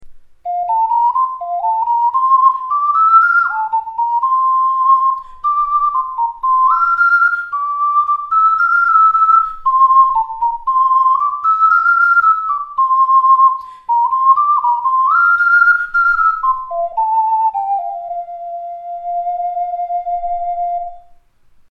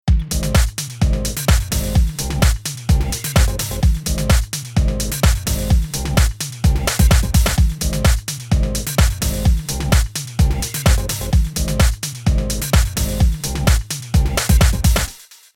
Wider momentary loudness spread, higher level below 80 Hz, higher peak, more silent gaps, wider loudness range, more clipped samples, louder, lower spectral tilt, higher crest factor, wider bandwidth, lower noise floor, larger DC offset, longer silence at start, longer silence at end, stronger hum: first, 11 LU vs 5 LU; second, -50 dBFS vs -18 dBFS; about the same, 0 dBFS vs 0 dBFS; neither; first, 7 LU vs 1 LU; neither; first, -13 LUFS vs -18 LUFS; second, -2.5 dB/octave vs -4.5 dB/octave; about the same, 12 dB vs 16 dB; second, 5.8 kHz vs 18.5 kHz; first, -48 dBFS vs -38 dBFS; neither; about the same, 0 s vs 0.05 s; first, 0.7 s vs 0.35 s; neither